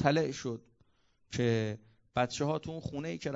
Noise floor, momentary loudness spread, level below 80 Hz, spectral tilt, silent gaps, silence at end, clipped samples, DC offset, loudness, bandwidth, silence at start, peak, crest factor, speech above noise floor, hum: -70 dBFS; 10 LU; -62 dBFS; -5.5 dB/octave; none; 0 s; under 0.1%; under 0.1%; -34 LUFS; 7.8 kHz; 0 s; -12 dBFS; 22 dB; 37 dB; none